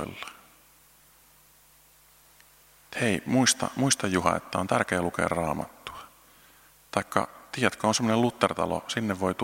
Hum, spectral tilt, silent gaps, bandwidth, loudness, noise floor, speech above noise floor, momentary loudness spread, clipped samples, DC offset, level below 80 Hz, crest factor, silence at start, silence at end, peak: none; -4 dB/octave; none; 16.5 kHz; -27 LUFS; -58 dBFS; 32 dB; 15 LU; under 0.1%; under 0.1%; -58 dBFS; 26 dB; 0 s; 0 s; -4 dBFS